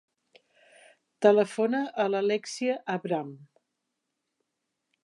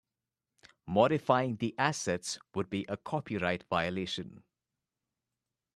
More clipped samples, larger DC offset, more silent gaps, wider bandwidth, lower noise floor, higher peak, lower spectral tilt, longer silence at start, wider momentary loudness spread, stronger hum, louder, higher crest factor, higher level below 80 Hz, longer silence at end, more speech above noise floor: neither; neither; neither; second, 11.5 kHz vs 13 kHz; second, -83 dBFS vs -90 dBFS; about the same, -8 dBFS vs -10 dBFS; about the same, -5 dB/octave vs -5 dB/octave; first, 1.2 s vs 0.85 s; about the same, 10 LU vs 10 LU; neither; first, -27 LUFS vs -32 LUFS; about the same, 22 dB vs 24 dB; second, -88 dBFS vs -68 dBFS; first, 1.6 s vs 1.35 s; about the same, 56 dB vs 58 dB